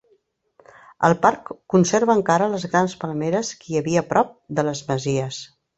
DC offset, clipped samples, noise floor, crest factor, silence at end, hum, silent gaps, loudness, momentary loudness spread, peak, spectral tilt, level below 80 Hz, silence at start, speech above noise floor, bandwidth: under 0.1%; under 0.1%; -63 dBFS; 20 dB; 0.3 s; none; none; -21 LUFS; 8 LU; -2 dBFS; -5.5 dB/octave; -58 dBFS; 1 s; 43 dB; 8.2 kHz